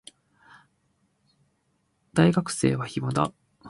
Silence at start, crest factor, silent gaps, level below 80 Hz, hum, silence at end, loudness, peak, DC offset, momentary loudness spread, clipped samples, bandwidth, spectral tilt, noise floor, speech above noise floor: 2.15 s; 22 dB; none; -58 dBFS; none; 0 s; -25 LUFS; -6 dBFS; under 0.1%; 8 LU; under 0.1%; 11.5 kHz; -6 dB/octave; -72 dBFS; 48 dB